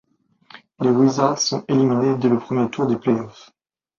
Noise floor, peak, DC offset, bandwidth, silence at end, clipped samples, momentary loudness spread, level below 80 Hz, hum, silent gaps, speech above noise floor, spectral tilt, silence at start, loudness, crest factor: -53 dBFS; -2 dBFS; under 0.1%; 7.4 kHz; 0.7 s; under 0.1%; 6 LU; -62 dBFS; none; none; 35 dB; -5.5 dB/octave; 0.8 s; -19 LUFS; 18 dB